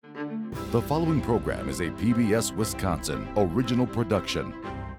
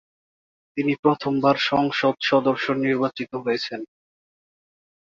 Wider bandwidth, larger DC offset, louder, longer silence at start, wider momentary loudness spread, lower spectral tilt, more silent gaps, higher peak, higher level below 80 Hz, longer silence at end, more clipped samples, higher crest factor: first, 18 kHz vs 7.4 kHz; neither; second, -27 LUFS vs -22 LUFS; second, 0.05 s vs 0.75 s; about the same, 9 LU vs 10 LU; about the same, -5.5 dB/octave vs -6 dB/octave; second, none vs 0.99-1.03 s; second, -10 dBFS vs -4 dBFS; first, -44 dBFS vs -66 dBFS; second, 0 s vs 1.2 s; neither; about the same, 16 dB vs 20 dB